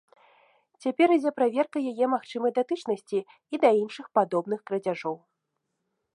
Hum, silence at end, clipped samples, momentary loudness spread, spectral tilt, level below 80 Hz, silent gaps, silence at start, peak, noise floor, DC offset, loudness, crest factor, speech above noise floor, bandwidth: none; 1 s; under 0.1%; 10 LU; -6 dB/octave; -84 dBFS; none; 0.85 s; -8 dBFS; -81 dBFS; under 0.1%; -27 LUFS; 20 dB; 55 dB; 11 kHz